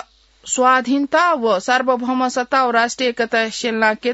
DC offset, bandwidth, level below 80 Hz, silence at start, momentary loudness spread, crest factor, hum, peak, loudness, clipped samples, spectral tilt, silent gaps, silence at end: under 0.1%; 8 kHz; -60 dBFS; 0.45 s; 5 LU; 16 dB; none; -2 dBFS; -17 LUFS; under 0.1%; -2.5 dB/octave; none; 0 s